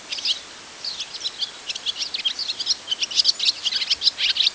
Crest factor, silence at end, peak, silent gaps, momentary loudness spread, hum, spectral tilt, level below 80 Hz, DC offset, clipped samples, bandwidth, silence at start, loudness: 20 dB; 0 s; -4 dBFS; none; 10 LU; none; 2 dB/octave; -64 dBFS; under 0.1%; under 0.1%; 8 kHz; 0 s; -22 LUFS